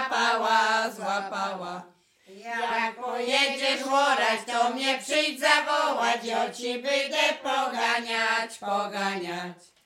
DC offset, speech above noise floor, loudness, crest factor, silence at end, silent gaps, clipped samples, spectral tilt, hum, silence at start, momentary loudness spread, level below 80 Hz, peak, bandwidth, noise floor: under 0.1%; 21 dB; -25 LUFS; 20 dB; 0.3 s; none; under 0.1%; -1.5 dB/octave; none; 0 s; 10 LU; -80 dBFS; -6 dBFS; 17 kHz; -48 dBFS